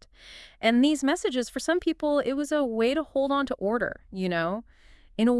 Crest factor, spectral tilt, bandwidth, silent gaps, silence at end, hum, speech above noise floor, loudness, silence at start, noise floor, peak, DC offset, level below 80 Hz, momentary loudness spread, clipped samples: 18 dB; -4.5 dB/octave; 12 kHz; none; 0 s; none; 23 dB; -26 LUFS; 0.25 s; -49 dBFS; -8 dBFS; under 0.1%; -56 dBFS; 10 LU; under 0.1%